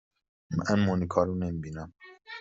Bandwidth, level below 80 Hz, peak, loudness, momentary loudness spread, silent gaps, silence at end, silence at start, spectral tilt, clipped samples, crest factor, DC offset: 7.8 kHz; -58 dBFS; -10 dBFS; -29 LUFS; 16 LU; none; 0 s; 0.5 s; -6.5 dB/octave; under 0.1%; 20 dB; under 0.1%